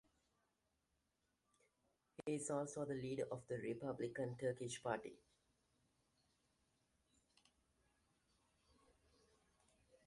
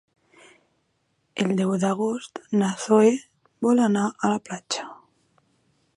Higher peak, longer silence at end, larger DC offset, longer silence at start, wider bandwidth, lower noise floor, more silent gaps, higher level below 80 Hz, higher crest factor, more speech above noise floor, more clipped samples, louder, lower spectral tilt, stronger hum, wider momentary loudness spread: second, -26 dBFS vs -6 dBFS; first, 4.9 s vs 1 s; neither; first, 2.2 s vs 1.35 s; about the same, 11.5 kHz vs 11.5 kHz; first, -87 dBFS vs -71 dBFS; neither; second, -82 dBFS vs -72 dBFS; about the same, 24 dB vs 20 dB; second, 41 dB vs 49 dB; neither; second, -46 LUFS vs -23 LUFS; about the same, -5 dB/octave vs -5.5 dB/octave; neither; second, 4 LU vs 12 LU